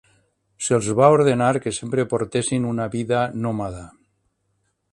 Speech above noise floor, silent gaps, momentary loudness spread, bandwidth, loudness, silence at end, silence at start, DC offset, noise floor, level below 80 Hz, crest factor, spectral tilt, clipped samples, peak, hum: 50 dB; none; 12 LU; 11.5 kHz; -21 LUFS; 1.05 s; 0.6 s; under 0.1%; -70 dBFS; -52 dBFS; 22 dB; -5.5 dB/octave; under 0.1%; 0 dBFS; none